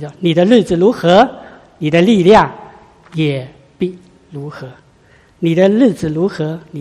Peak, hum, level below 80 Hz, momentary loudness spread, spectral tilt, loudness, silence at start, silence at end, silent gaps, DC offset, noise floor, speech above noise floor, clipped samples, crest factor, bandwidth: 0 dBFS; none; -46 dBFS; 19 LU; -7 dB/octave; -13 LUFS; 0 s; 0 s; none; under 0.1%; -48 dBFS; 36 dB; 0.1%; 14 dB; 12 kHz